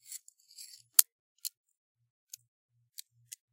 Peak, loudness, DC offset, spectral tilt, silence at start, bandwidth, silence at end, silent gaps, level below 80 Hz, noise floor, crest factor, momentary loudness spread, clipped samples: 0 dBFS; -28 LUFS; under 0.1%; 5 dB/octave; 0.1 s; 17 kHz; 2.05 s; 1.12-1.35 s; under -90 dBFS; -55 dBFS; 38 dB; 27 LU; under 0.1%